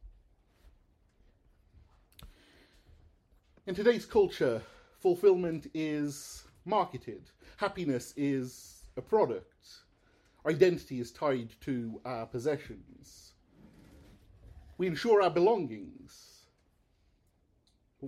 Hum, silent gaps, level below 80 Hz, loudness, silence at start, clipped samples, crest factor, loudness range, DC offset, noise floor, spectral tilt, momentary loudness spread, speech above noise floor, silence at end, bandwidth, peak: none; none; -62 dBFS; -31 LUFS; 0.05 s; under 0.1%; 22 dB; 7 LU; under 0.1%; -71 dBFS; -6 dB/octave; 20 LU; 40 dB; 0 s; 14 kHz; -10 dBFS